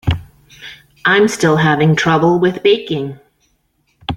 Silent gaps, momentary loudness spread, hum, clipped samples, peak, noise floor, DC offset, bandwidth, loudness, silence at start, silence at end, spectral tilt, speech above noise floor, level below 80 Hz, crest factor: none; 22 LU; none; under 0.1%; 0 dBFS; -62 dBFS; under 0.1%; 13.5 kHz; -14 LUFS; 0.05 s; 0 s; -5.5 dB/octave; 49 dB; -40 dBFS; 14 dB